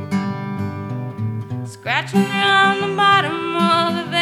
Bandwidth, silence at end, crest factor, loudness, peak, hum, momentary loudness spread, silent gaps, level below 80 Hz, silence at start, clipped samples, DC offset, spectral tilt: 15 kHz; 0 s; 16 dB; -18 LUFS; -2 dBFS; none; 13 LU; none; -64 dBFS; 0 s; under 0.1%; under 0.1%; -5 dB/octave